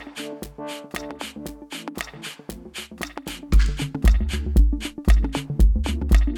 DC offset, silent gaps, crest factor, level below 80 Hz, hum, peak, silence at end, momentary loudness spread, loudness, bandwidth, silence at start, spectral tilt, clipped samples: under 0.1%; none; 18 dB; -22 dBFS; none; -4 dBFS; 0 s; 14 LU; -25 LUFS; 16 kHz; 0 s; -5.5 dB/octave; under 0.1%